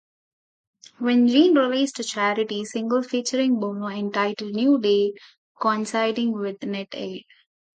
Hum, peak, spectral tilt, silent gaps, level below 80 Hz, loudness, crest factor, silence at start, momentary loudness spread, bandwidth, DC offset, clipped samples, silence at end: none; -6 dBFS; -4.5 dB/octave; 5.38-5.55 s; -76 dBFS; -23 LUFS; 18 dB; 1 s; 12 LU; 9.2 kHz; under 0.1%; under 0.1%; 0.55 s